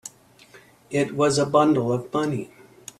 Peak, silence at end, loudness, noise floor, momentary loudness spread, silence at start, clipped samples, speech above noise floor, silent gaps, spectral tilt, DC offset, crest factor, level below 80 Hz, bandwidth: -6 dBFS; 0.55 s; -22 LUFS; -52 dBFS; 23 LU; 0.05 s; under 0.1%; 30 dB; none; -5.5 dB/octave; under 0.1%; 18 dB; -62 dBFS; 13.5 kHz